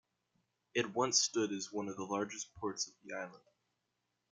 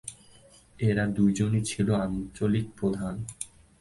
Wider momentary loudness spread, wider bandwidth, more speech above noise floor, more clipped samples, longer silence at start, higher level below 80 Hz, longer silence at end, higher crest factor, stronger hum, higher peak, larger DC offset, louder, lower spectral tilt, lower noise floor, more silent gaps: about the same, 14 LU vs 13 LU; about the same, 11 kHz vs 11.5 kHz; first, 47 dB vs 29 dB; neither; first, 0.75 s vs 0.05 s; second, -80 dBFS vs -50 dBFS; first, 0.95 s vs 0.35 s; first, 24 dB vs 16 dB; neither; second, -16 dBFS vs -12 dBFS; neither; second, -37 LUFS vs -28 LUFS; second, -2 dB/octave vs -6.5 dB/octave; first, -85 dBFS vs -55 dBFS; neither